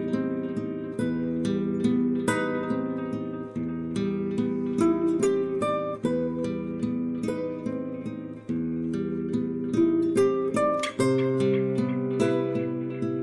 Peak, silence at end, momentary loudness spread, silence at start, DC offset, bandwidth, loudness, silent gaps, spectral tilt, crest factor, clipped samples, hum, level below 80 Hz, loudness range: -8 dBFS; 0 s; 8 LU; 0 s; under 0.1%; 11.5 kHz; -27 LUFS; none; -7 dB/octave; 18 dB; under 0.1%; none; -62 dBFS; 5 LU